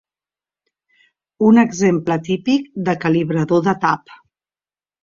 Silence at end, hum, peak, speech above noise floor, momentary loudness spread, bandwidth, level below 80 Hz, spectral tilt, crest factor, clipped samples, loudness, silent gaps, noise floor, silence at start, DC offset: 0.9 s; 50 Hz at -45 dBFS; -2 dBFS; over 74 dB; 7 LU; 7.6 kHz; -58 dBFS; -6.5 dB/octave; 16 dB; under 0.1%; -17 LUFS; none; under -90 dBFS; 1.4 s; under 0.1%